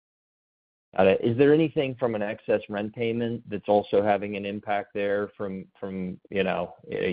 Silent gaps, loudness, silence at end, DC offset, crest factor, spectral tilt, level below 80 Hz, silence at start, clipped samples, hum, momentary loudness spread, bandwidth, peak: none; -26 LUFS; 0 s; under 0.1%; 18 dB; -5.5 dB/octave; -62 dBFS; 0.95 s; under 0.1%; none; 12 LU; 4.9 kHz; -8 dBFS